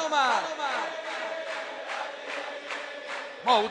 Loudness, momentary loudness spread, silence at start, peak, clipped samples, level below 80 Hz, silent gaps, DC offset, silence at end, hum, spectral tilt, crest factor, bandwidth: -30 LUFS; 11 LU; 0 s; -8 dBFS; under 0.1%; -84 dBFS; none; under 0.1%; 0 s; none; -1 dB/octave; 22 dB; 10 kHz